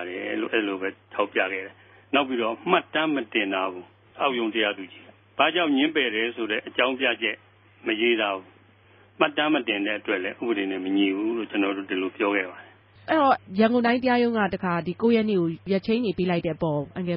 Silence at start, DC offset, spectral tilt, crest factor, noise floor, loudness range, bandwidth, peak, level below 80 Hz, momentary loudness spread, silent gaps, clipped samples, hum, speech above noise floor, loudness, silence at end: 0 s; under 0.1%; -10 dB/octave; 20 dB; -56 dBFS; 3 LU; 5.6 kHz; -6 dBFS; -62 dBFS; 8 LU; none; under 0.1%; none; 31 dB; -25 LUFS; 0 s